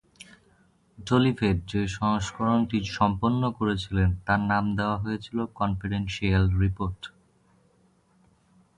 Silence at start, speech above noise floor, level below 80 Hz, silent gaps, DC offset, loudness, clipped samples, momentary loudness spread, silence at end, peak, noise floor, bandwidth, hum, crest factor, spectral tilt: 1 s; 38 dB; -40 dBFS; none; under 0.1%; -26 LUFS; under 0.1%; 7 LU; 1.7 s; -8 dBFS; -64 dBFS; 11 kHz; none; 18 dB; -6.5 dB/octave